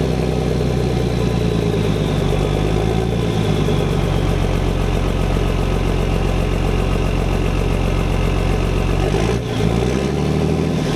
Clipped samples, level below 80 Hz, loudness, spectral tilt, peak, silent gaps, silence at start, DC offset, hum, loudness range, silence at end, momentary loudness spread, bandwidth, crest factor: under 0.1%; -22 dBFS; -19 LUFS; -6.5 dB/octave; -4 dBFS; none; 0 s; under 0.1%; none; 1 LU; 0 s; 1 LU; 13.5 kHz; 14 dB